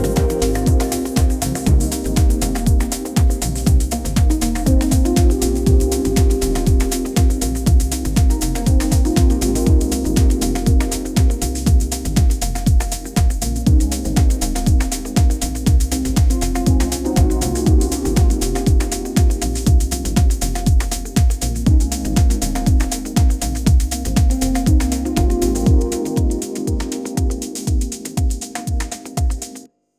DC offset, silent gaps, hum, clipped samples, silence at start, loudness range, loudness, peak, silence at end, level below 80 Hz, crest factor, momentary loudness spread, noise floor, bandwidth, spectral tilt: under 0.1%; none; none; under 0.1%; 0 s; 2 LU; -18 LUFS; -2 dBFS; 0.3 s; -18 dBFS; 14 dB; 5 LU; -39 dBFS; 16 kHz; -5.5 dB/octave